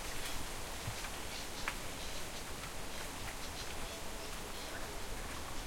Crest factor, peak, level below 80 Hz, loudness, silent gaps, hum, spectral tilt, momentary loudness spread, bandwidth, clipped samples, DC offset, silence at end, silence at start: 20 dB; -22 dBFS; -48 dBFS; -43 LUFS; none; none; -2.5 dB/octave; 3 LU; 16.5 kHz; under 0.1%; under 0.1%; 0 s; 0 s